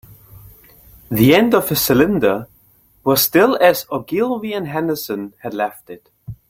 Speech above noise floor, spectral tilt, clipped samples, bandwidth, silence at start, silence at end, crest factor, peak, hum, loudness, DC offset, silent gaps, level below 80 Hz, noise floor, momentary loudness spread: 38 dB; -5 dB/octave; under 0.1%; 16.5 kHz; 0.35 s; 0.15 s; 16 dB; 0 dBFS; none; -16 LUFS; under 0.1%; none; -48 dBFS; -54 dBFS; 14 LU